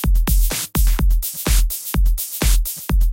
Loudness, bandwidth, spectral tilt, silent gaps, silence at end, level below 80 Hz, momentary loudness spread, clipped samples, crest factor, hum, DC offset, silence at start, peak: -20 LUFS; 17 kHz; -4 dB/octave; none; 0 s; -16 dBFS; 3 LU; under 0.1%; 12 dB; none; under 0.1%; 0 s; -4 dBFS